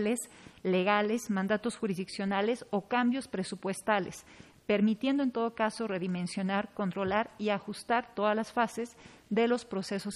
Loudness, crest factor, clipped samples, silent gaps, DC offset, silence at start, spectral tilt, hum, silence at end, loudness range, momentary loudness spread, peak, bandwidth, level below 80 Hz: -31 LUFS; 18 dB; under 0.1%; none; under 0.1%; 0 s; -5.5 dB/octave; none; 0 s; 1 LU; 7 LU; -12 dBFS; 13 kHz; -68 dBFS